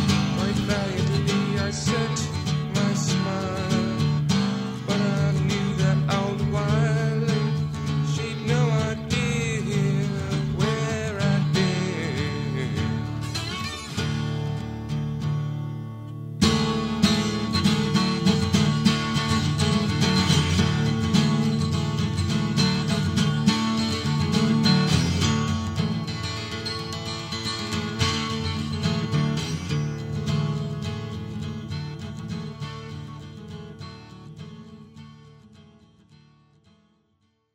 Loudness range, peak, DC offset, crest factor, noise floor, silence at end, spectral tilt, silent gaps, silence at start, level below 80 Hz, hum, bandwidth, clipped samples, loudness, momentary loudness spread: 9 LU; -6 dBFS; under 0.1%; 18 dB; -69 dBFS; 1.95 s; -5.5 dB/octave; none; 0 s; -46 dBFS; none; 13 kHz; under 0.1%; -24 LUFS; 12 LU